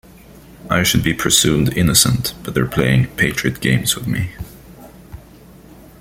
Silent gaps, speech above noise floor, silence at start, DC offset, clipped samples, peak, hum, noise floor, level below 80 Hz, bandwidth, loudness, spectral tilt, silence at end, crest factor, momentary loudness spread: none; 26 dB; 0.3 s; under 0.1%; under 0.1%; 0 dBFS; none; -42 dBFS; -38 dBFS; 16.5 kHz; -16 LUFS; -3.5 dB/octave; 0.8 s; 18 dB; 10 LU